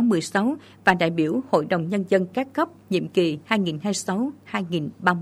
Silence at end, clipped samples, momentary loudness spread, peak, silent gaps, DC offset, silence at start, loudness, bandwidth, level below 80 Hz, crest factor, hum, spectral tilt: 0 s; under 0.1%; 6 LU; -2 dBFS; none; under 0.1%; 0 s; -24 LUFS; 15 kHz; -64 dBFS; 22 dB; none; -5.5 dB/octave